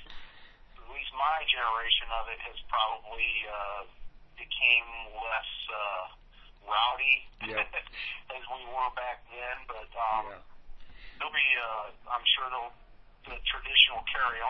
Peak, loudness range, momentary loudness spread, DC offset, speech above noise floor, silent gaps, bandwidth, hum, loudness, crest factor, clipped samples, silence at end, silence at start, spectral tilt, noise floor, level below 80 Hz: -6 dBFS; 7 LU; 17 LU; under 0.1%; 21 dB; none; 6 kHz; none; -29 LUFS; 26 dB; under 0.1%; 0 s; 0 s; 3.5 dB/octave; -52 dBFS; -50 dBFS